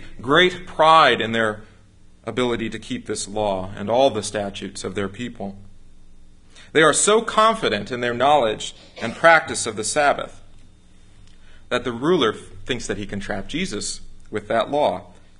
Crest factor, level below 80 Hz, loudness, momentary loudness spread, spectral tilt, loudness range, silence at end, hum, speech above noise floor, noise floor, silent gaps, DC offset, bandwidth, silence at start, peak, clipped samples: 22 dB; -46 dBFS; -20 LUFS; 16 LU; -3 dB/octave; 7 LU; 0.25 s; none; 28 dB; -48 dBFS; none; under 0.1%; 11.5 kHz; 0 s; 0 dBFS; under 0.1%